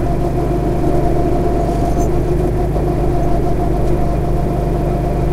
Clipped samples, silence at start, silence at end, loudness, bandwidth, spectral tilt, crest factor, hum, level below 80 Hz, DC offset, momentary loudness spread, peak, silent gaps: under 0.1%; 0 s; 0 s; -17 LUFS; 14 kHz; -8.5 dB/octave; 12 dB; 50 Hz at -20 dBFS; -20 dBFS; under 0.1%; 1 LU; -2 dBFS; none